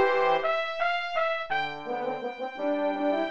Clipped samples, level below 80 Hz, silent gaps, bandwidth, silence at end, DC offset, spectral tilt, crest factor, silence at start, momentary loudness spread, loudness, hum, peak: under 0.1%; -66 dBFS; none; 7.8 kHz; 0 s; 0.6%; -5 dB/octave; 16 dB; 0 s; 8 LU; -28 LUFS; none; -12 dBFS